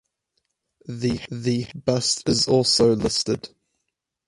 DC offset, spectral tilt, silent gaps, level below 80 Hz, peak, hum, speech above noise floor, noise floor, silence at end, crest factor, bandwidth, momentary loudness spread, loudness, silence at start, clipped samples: under 0.1%; -4.5 dB/octave; none; -50 dBFS; -6 dBFS; none; 58 dB; -80 dBFS; 0.8 s; 18 dB; 11.5 kHz; 10 LU; -21 LUFS; 0.9 s; under 0.1%